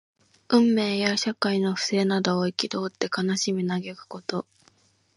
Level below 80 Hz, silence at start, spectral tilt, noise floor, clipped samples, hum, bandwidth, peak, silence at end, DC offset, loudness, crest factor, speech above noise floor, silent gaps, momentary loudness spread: -72 dBFS; 0.5 s; -4.5 dB/octave; -62 dBFS; under 0.1%; none; 11.5 kHz; -4 dBFS; 0.75 s; under 0.1%; -25 LUFS; 22 dB; 38 dB; none; 11 LU